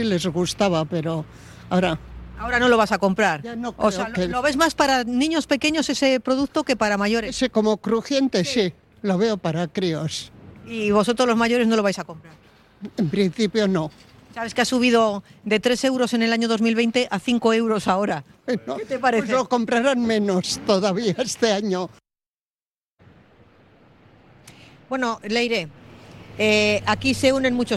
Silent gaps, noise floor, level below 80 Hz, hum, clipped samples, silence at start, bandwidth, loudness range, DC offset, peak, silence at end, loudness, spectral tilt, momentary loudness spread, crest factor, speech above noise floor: 22.27-22.58 s, 22.66-22.97 s; under -90 dBFS; -50 dBFS; none; under 0.1%; 0 s; 13 kHz; 6 LU; under 0.1%; -4 dBFS; 0 s; -21 LUFS; -4.5 dB/octave; 10 LU; 18 dB; over 69 dB